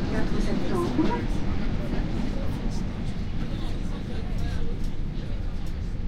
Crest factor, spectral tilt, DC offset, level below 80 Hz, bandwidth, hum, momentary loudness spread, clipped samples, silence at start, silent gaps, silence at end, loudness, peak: 14 dB; -7 dB/octave; under 0.1%; -30 dBFS; 9.8 kHz; none; 7 LU; under 0.1%; 0 s; none; 0 s; -30 LUFS; -12 dBFS